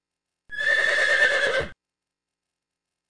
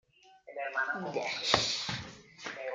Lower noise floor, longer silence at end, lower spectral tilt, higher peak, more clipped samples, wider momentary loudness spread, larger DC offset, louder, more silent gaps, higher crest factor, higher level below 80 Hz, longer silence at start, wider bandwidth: first, -87 dBFS vs -55 dBFS; first, 1.35 s vs 0 s; about the same, -1.5 dB/octave vs -2 dB/octave; about the same, -8 dBFS vs -8 dBFS; neither; about the same, 15 LU vs 16 LU; neither; first, -20 LUFS vs -33 LUFS; neither; second, 18 dB vs 28 dB; first, -56 dBFS vs -64 dBFS; first, 0.5 s vs 0.25 s; second, 10.5 kHz vs 13 kHz